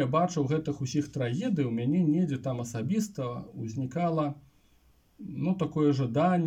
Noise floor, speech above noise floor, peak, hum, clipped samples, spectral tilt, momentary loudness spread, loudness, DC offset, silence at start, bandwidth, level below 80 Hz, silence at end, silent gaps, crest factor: -64 dBFS; 35 dB; -14 dBFS; none; under 0.1%; -7.5 dB/octave; 10 LU; -29 LUFS; under 0.1%; 0 s; 15 kHz; -64 dBFS; 0 s; none; 16 dB